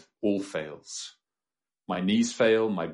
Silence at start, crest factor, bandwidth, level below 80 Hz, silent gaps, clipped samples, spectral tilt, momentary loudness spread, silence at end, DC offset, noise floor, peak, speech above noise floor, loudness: 0.2 s; 18 dB; 11.5 kHz; -70 dBFS; none; under 0.1%; -4.5 dB/octave; 15 LU; 0 s; under 0.1%; under -90 dBFS; -10 dBFS; over 63 dB; -27 LUFS